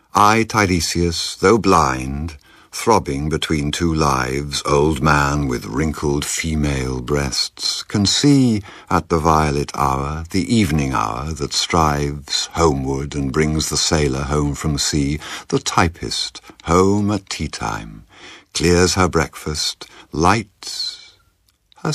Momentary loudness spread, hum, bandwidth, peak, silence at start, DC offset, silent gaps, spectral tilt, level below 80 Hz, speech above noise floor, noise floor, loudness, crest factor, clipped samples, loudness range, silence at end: 10 LU; none; 15 kHz; 0 dBFS; 0.15 s; under 0.1%; none; -4.5 dB/octave; -32 dBFS; 42 dB; -61 dBFS; -18 LUFS; 18 dB; under 0.1%; 2 LU; 0 s